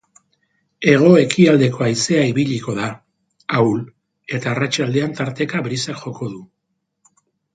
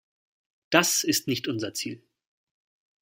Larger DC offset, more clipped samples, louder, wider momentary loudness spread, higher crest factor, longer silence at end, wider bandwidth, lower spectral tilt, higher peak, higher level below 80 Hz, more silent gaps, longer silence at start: neither; neither; first, -17 LUFS vs -25 LUFS; about the same, 16 LU vs 14 LU; second, 18 dB vs 26 dB; about the same, 1.1 s vs 1.05 s; second, 9.4 kHz vs 16.5 kHz; first, -5.5 dB/octave vs -2.5 dB/octave; about the same, 0 dBFS vs -2 dBFS; first, -60 dBFS vs -72 dBFS; neither; about the same, 0.8 s vs 0.7 s